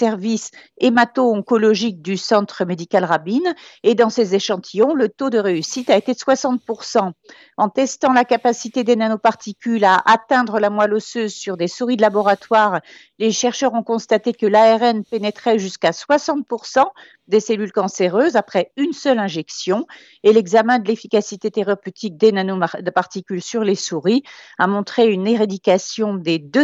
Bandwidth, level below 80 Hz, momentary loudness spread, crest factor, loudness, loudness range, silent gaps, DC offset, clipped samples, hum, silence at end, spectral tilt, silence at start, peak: 8 kHz; -72 dBFS; 9 LU; 16 dB; -18 LUFS; 3 LU; none; under 0.1%; under 0.1%; none; 0 s; -4.5 dB/octave; 0 s; -2 dBFS